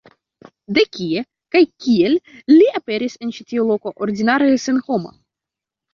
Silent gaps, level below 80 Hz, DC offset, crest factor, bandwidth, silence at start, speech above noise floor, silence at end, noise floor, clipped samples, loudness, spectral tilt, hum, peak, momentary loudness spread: none; -60 dBFS; under 0.1%; 16 dB; 7.2 kHz; 0.7 s; 70 dB; 0.85 s; -86 dBFS; under 0.1%; -17 LUFS; -5.5 dB/octave; none; -2 dBFS; 11 LU